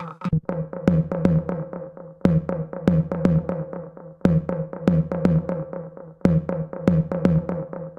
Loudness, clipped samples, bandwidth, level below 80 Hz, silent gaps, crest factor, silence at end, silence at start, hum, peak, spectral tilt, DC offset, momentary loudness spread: -23 LUFS; under 0.1%; 6 kHz; -42 dBFS; none; 20 dB; 0 s; 0 s; none; -4 dBFS; -10 dB/octave; under 0.1%; 13 LU